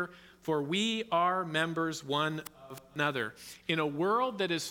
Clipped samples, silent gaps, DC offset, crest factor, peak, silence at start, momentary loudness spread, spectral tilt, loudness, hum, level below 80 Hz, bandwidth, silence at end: under 0.1%; none; under 0.1%; 18 dB; -14 dBFS; 0 s; 12 LU; -4.5 dB/octave; -32 LUFS; none; -72 dBFS; 18 kHz; 0 s